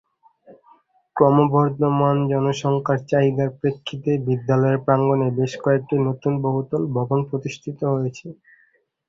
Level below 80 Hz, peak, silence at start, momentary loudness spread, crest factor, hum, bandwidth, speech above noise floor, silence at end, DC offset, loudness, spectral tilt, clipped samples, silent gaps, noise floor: -58 dBFS; -2 dBFS; 0.5 s; 9 LU; 18 dB; none; 7.6 kHz; 42 dB; 0.75 s; under 0.1%; -21 LUFS; -8 dB/octave; under 0.1%; none; -62 dBFS